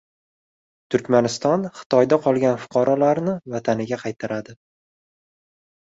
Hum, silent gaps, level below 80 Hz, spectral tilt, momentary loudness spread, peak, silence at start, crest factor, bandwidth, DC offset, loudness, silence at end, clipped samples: none; 1.86-1.90 s; -62 dBFS; -6 dB/octave; 10 LU; -2 dBFS; 0.9 s; 20 dB; 8 kHz; under 0.1%; -21 LUFS; 1.4 s; under 0.1%